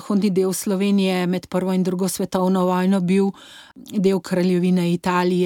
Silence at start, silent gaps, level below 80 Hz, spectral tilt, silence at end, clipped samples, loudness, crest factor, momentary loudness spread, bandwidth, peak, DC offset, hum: 0 s; none; -60 dBFS; -6.5 dB/octave; 0 s; under 0.1%; -20 LUFS; 14 dB; 4 LU; 17 kHz; -6 dBFS; under 0.1%; none